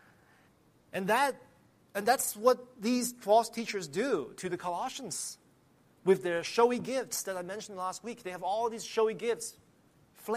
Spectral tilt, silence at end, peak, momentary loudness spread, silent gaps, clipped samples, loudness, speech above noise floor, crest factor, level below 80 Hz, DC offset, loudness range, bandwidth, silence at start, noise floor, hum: -3.5 dB/octave; 0 s; -12 dBFS; 13 LU; none; under 0.1%; -32 LUFS; 34 dB; 22 dB; -76 dBFS; under 0.1%; 4 LU; 15 kHz; 0.95 s; -65 dBFS; none